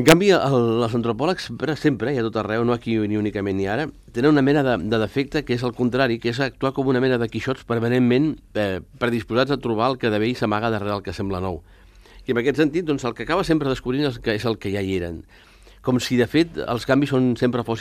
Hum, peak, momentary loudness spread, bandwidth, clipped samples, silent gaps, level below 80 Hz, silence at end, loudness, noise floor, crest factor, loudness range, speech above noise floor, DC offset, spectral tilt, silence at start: none; 0 dBFS; 8 LU; 15.5 kHz; under 0.1%; none; -46 dBFS; 0 s; -22 LUFS; -47 dBFS; 22 dB; 3 LU; 26 dB; under 0.1%; -6 dB/octave; 0 s